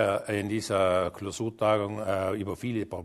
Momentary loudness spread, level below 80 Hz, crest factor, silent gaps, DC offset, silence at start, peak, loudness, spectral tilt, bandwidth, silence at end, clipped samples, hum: 7 LU; -60 dBFS; 18 dB; none; under 0.1%; 0 s; -10 dBFS; -29 LUFS; -5.5 dB/octave; 13.5 kHz; 0 s; under 0.1%; none